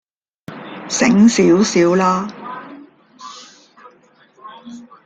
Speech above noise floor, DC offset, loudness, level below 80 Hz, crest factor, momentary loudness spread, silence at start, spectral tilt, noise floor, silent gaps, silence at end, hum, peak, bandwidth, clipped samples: 39 dB; under 0.1%; -14 LUFS; -58 dBFS; 16 dB; 26 LU; 0.5 s; -5 dB/octave; -51 dBFS; none; 0.25 s; none; -2 dBFS; 9.2 kHz; under 0.1%